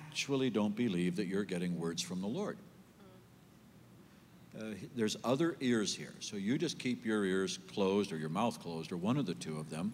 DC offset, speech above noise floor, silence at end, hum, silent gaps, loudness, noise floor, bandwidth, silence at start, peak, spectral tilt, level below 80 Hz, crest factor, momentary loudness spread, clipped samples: under 0.1%; 25 dB; 0 s; none; none; -36 LUFS; -60 dBFS; 16 kHz; 0 s; -22 dBFS; -5 dB/octave; -76 dBFS; 16 dB; 10 LU; under 0.1%